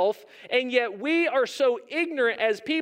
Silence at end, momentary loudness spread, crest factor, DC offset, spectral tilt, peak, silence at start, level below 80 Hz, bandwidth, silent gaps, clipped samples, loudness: 0 s; 4 LU; 18 dB; under 0.1%; -3 dB/octave; -8 dBFS; 0 s; -84 dBFS; 16 kHz; none; under 0.1%; -25 LUFS